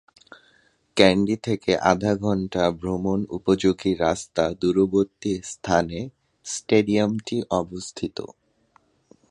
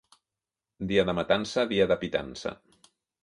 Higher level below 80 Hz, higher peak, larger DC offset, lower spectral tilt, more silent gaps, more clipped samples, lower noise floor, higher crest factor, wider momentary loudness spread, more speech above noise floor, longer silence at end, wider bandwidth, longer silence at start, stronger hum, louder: first, -50 dBFS vs -56 dBFS; first, 0 dBFS vs -8 dBFS; neither; about the same, -5.5 dB/octave vs -5 dB/octave; neither; neither; second, -62 dBFS vs -90 dBFS; about the same, 24 dB vs 20 dB; about the same, 13 LU vs 12 LU; second, 40 dB vs 63 dB; first, 1.05 s vs 0.7 s; about the same, 11.5 kHz vs 11.5 kHz; first, 0.95 s vs 0.8 s; neither; first, -23 LUFS vs -28 LUFS